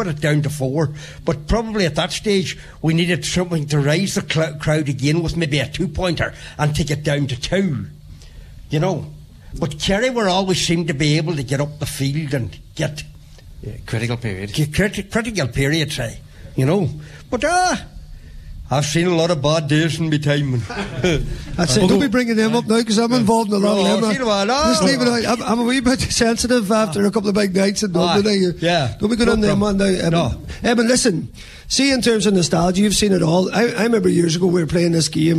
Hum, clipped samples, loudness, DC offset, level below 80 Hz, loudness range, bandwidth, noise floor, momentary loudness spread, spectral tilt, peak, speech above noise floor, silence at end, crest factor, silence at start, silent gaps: none; under 0.1%; -18 LUFS; under 0.1%; -36 dBFS; 6 LU; 14 kHz; -39 dBFS; 9 LU; -5 dB/octave; -2 dBFS; 22 dB; 0 s; 16 dB; 0 s; none